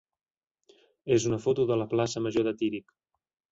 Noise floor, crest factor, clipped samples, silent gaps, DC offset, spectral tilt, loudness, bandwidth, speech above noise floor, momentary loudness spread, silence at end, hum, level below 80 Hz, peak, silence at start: under -90 dBFS; 18 dB; under 0.1%; none; under 0.1%; -6 dB/octave; -28 LUFS; 8 kHz; over 63 dB; 6 LU; 0.7 s; none; -62 dBFS; -12 dBFS; 1.05 s